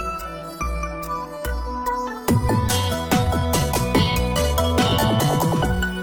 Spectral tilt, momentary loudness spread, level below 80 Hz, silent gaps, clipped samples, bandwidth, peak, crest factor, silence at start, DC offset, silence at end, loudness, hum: -5 dB/octave; 10 LU; -30 dBFS; none; under 0.1%; 19.5 kHz; -4 dBFS; 18 dB; 0 s; under 0.1%; 0 s; -21 LUFS; none